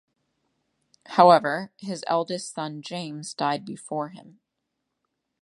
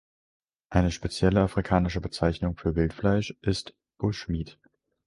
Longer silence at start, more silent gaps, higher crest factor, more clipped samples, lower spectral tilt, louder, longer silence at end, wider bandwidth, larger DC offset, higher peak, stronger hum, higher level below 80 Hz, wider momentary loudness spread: first, 1.1 s vs 0.7 s; neither; first, 26 dB vs 20 dB; neither; second, -4.5 dB/octave vs -6.5 dB/octave; first, -24 LUFS vs -27 LUFS; first, 1.15 s vs 0.55 s; about the same, 11.5 kHz vs 11.5 kHz; neither; first, -2 dBFS vs -8 dBFS; neither; second, -80 dBFS vs -40 dBFS; first, 17 LU vs 8 LU